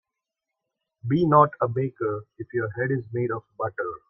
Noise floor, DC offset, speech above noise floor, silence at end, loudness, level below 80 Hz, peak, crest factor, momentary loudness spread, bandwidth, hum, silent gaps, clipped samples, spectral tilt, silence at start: -85 dBFS; under 0.1%; 61 dB; 0.15 s; -25 LUFS; -62 dBFS; -4 dBFS; 22 dB; 13 LU; 5.8 kHz; none; none; under 0.1%; -11 dB/octave; 1.05 s